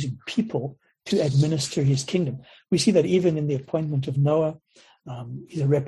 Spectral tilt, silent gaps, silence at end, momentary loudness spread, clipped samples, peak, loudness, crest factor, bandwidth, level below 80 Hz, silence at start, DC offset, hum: -6.5 dB/octave; none; 0 s; 16 LU; under 0.1%; -6 dBFS; -24 LUFS; 16 dB; 12 kHz; -58 dBFS; 0 s; under 0.1%; none